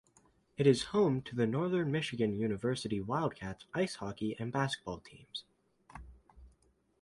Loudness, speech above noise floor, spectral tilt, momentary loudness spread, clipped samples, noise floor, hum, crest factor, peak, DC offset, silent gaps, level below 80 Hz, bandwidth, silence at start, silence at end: -34 LUFS; 37 dB; -6 dB/octave; 16 LU; under 0.1%; -71 dBFS; none; 22 dB; -14 dBFS; under 0.1%; none; -62 dBFS; 11.5 kHz; 0.6 s; 0.55 s